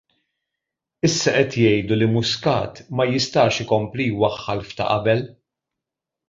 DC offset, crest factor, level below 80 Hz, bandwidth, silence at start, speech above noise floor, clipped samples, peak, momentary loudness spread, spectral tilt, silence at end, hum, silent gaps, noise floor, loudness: under 0.1%; 20 dB; -50 dBFS; 7.8 kHz; 1.05 s; 65 dB; under 0.1%; -2 dBFS; 7 LU; -5 dB/octave; 1 s; none; none; -85 dBFS; -20 LUFS